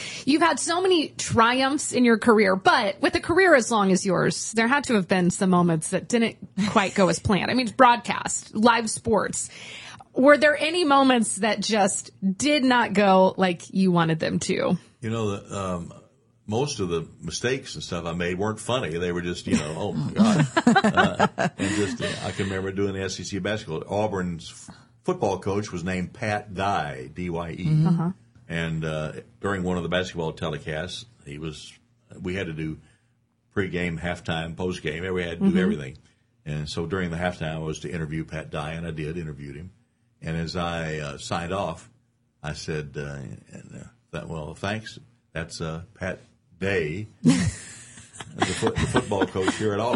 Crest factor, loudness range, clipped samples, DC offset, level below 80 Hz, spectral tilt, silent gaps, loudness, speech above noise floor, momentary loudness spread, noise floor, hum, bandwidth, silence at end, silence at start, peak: 22 dB; 12 LU; under 0.1%; under 0.1%; -50 dBFS; -5 dB/octave; none; -24 LUFS; 43 dB; 16 LU; -67 dBFS; none; 11.5 kHz; 0 s; 0 s; -4 dBFS